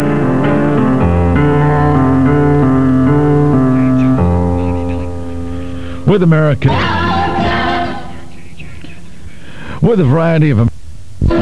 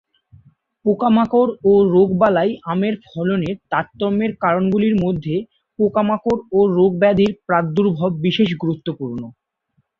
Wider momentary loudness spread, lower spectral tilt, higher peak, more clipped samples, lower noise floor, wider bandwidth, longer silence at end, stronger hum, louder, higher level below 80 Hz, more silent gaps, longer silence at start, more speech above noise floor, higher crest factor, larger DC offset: first, 14 LU vs 9 LU; about the same, -8.5 dB/octave vs -9 dB/octave; about the same, 0 dBFS vs -2 dBFS; neither; second, -34 dBFS vs -67 dBFS; first, 11 kHz vs 6.8 kHz; second, 0 s vs 0.7 s; neither; first, -12 LUFS vs -18 LUFS; first, -28 dBFS vs -52 dBFS; neither; second, 0 s vs 0.85 s; second, 24 dB vs 50 dB; about the same, 12 dB vs 16 dB; first, 7% vs under 0.1%